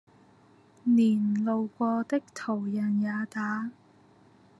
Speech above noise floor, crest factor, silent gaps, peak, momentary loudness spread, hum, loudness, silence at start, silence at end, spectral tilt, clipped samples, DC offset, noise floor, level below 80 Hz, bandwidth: 32 dB; 14 dB; none; -14 dBFS; 10 LU; none; -28 LUFS; 0.85 s; 0.85 s; -7.5 dB/octave; under 0.1%; under 0.1%; -59 dBFS; -80 dBFS; 10.5 kHz